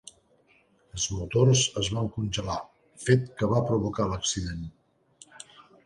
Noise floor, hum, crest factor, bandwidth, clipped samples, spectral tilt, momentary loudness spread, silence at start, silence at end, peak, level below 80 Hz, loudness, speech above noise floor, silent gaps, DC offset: -64 dBFS; none; 22 dB; 11 kHz; under 0.1%; -4.5 dB/octave; 21 LU; 0.95 s; 0.25 s; -6 dBFS; -48 dBFS; -27 LUFS; 37 dB; none; under 0.1%